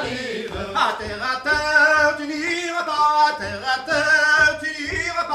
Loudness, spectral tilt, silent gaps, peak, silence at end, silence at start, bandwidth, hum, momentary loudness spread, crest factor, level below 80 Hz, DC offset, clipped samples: -19 LUFS; -2.5 dB/octave; none; -4 dBFS; 0 s; 0 s; 14.5 kHz; none; 11 LU; 16 dB; -46 dBFS; under 0.1%; under 0.1%